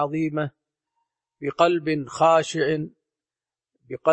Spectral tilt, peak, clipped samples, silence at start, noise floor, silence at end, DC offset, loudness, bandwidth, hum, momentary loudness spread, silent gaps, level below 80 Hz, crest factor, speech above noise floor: -5.5 dB/octave; -6 dBFS; under 0.1%; 0 s; under -90 dBFS; 0 s; under 0.1%; -23 LUFS; 8.8 kHz; none; 14 LU; none; -68 dBFS; 18 dB; over 68 dB